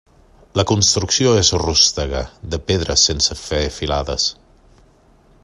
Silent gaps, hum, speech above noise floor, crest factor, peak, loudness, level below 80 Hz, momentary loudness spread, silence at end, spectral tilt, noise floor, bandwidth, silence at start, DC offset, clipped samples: none; none; 34 dB; 18 dB; 0 dBFS; -16 LUFS; -34 dBFS; 11 LU; 1.1 s; -3 dB/octave; -51 dBFS; 12 kHz; 0.55 s; under 0.1%; under 0.1%